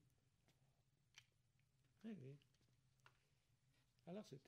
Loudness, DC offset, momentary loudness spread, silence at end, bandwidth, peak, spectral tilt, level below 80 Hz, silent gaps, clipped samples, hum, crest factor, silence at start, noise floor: -60 LUFS; under 0.1%; 10 LU; 0 s; 10 kHz; -44 dBFS; -6.5 dB/octave; under -90 dBFS; none; under 0.1%; none; 20 dB; 0.05 s; -83 dBFS